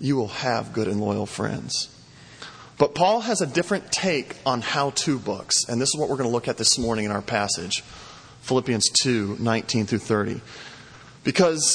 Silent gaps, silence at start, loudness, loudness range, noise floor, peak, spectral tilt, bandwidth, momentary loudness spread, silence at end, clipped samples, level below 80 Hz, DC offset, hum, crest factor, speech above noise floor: none; 0 s; -23 LUFS; 2 LU; -46 dBFS; -4 dBFS; -3.5 dB/octave; 10.5 kHz; 19 LU; 0 s; under 0.1%; -56 dBFS; under 0.1%; none; 20 dB; 22 dB